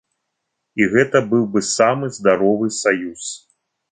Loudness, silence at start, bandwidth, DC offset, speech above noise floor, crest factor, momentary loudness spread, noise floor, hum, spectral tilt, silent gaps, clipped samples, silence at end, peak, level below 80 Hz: -17 LUFS; 0.75 s; 9.6 kHz; under 0.1%; 59 dB; 16 dB; 14 LU; -76 dBFS; none; -4.5 dB/octave; none; under 0.1%; 0.55 s; -2 dBFS; -58 dBFS